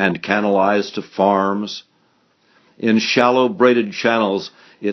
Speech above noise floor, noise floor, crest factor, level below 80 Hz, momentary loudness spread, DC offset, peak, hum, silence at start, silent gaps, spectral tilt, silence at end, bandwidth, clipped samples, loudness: 43 dB; -60 dBFS; 18 dB; -62 dBFS; 12 LU; under 0.1%; 0 dBFS; none; 0 s; none; -5 dB/octave; 0 s; 6.6 kHz; under 0.1%; -17 LUFS